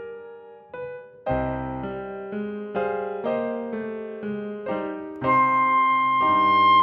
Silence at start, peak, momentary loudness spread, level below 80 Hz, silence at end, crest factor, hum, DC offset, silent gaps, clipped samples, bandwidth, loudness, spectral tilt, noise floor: 0 s; -8 dBFS; 17 LU; -50 dBFS; 0 s; 16 dB; none; under 0.1%; none; under 0.1%; 5.6 kHz; -24 LUFS; -7.5 dB/octave; -43 dBFS